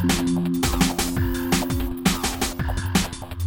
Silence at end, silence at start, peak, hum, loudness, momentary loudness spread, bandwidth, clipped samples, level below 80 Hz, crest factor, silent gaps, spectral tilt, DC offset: 0 s; 0 s; -6 dBFS; none; -23 LUFS; 5 LU; 17 kHz; under 0.1%; -32 dBFS; 16 dB; none; -4.5 dB/octave; under 0.1%